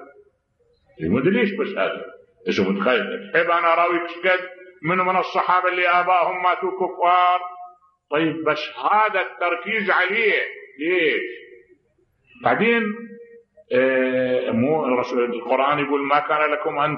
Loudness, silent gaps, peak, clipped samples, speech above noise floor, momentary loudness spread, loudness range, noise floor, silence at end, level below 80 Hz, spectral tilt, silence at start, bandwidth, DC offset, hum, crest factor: -20 LUFS; none; -4 dBFS; under 0.1%; 44 dB; 9 LU; 3 LU; -64 dBFS; 0 s; -64 dBFS; -6.5 dB/octave; 0 s; 6.6 kHz; under 0.1%; none; 18 dB